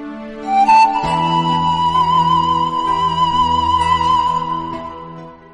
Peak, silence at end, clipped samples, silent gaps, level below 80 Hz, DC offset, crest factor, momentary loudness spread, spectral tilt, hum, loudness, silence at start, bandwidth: -4 dBFS; 0.2 s; under 0.1%; none; -40 dBFS; under 0.1%; 12 dB; 16 LU; -5 dB/octave; none; -15 LUFS; 0 s; 11 kHz